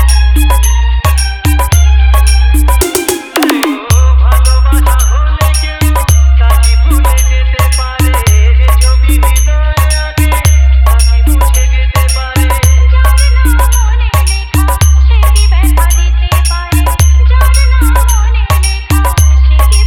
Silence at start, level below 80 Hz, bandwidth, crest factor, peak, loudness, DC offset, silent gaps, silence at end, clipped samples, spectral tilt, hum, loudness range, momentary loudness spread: 0 s; -8 dBFS; 17 kHz; 6 dB; 0 dBFS; -9 LUFS; under 0.1%; none; 0 s; 0.5%; -4.5 dB/octave; none; 1 LU; 4 LU